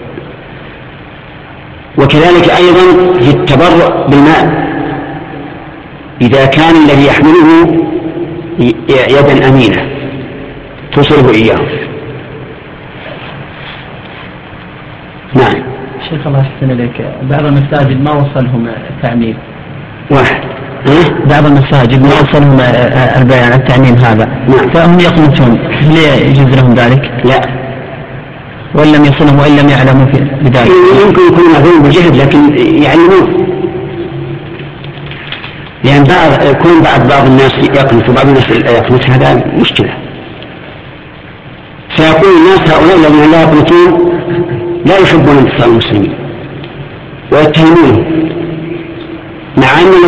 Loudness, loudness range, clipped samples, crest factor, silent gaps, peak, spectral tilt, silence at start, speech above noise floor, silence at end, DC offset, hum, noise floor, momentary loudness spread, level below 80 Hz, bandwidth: -6 LUFS; 7 LU; 1%; 6 dB; none; 0 dBFS; -7.5 dB/octave; 0 s; 24 dB; 0 s; under 0.1%; none; -28 dBFS; 21 LU; -30 dBFS; 8.4 kHz